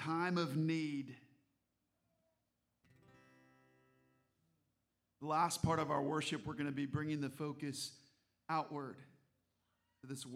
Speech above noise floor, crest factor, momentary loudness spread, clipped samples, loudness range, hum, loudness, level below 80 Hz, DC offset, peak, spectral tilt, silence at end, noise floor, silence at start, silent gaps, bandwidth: 46 dB; 20 dB; 15 LU; under 0.1%; 7 LU; none; -40 LUFS; -70 dBFS; under 0.1%; -22 dBFS; -5.5 dB/octave; 0 s; -85 dBFS; 0 s; none; 15.5 kHz